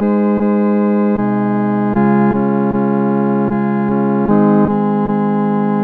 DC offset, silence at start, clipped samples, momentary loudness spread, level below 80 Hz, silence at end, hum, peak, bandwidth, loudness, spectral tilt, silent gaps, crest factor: under 0.1%; 0 s; under 0.1%; 3 LU; -44 dBFS; 0 s; none; 0 dBFS; 3.5 kHz; -14 LUFS; -12 dB/octave; none; 14 dB